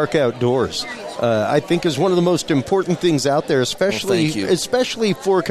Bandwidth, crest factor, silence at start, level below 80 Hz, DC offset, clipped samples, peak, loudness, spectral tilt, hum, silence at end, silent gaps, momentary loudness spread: 14.5 kHz; 14 dB; 0 s; -52 dBFS; under 0.1%; under 0.1%; -4 dBFS; -18 LUFS; -5 dB/octave; none; 0 s; none; 3 LU